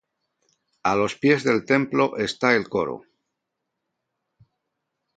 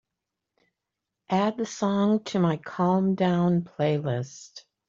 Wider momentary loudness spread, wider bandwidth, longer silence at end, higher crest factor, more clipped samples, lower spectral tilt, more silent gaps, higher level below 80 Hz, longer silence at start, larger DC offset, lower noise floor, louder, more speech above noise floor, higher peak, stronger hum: about the same, 7 LU vs 8 LU; first, 9.2 kHz vs 7.6 kHz; first, 2.15 s vs 0.3 s; first, 22 dB vs 16 dB; neither; second, -5.5 dB/octave vs -7 dB/octave; neither; about the same, -62 dBFS vs -66 dBFS; second, 0.85 s vs 1.3 s; neither; second, -81 dBFS vs -85 dBFS; first, -22 LUFS vs -25 LUFS; about the same, 59 dB vs 61 dB; first, -2 dBFS vs -12 dBFS; neither